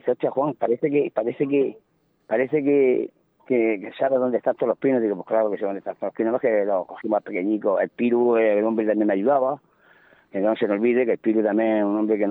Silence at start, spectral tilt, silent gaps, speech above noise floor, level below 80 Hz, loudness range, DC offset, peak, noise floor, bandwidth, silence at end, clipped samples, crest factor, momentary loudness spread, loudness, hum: 0.05 s; -10.5 dB/octave; none; 34 dB; -76 dBFS; 2 LU; under 0.1%; -8 dBFS; -55 dBFS; 4.1 kHz; 0 s; under 0.1%; 14 dB; 7 LU; -22 LUFS; none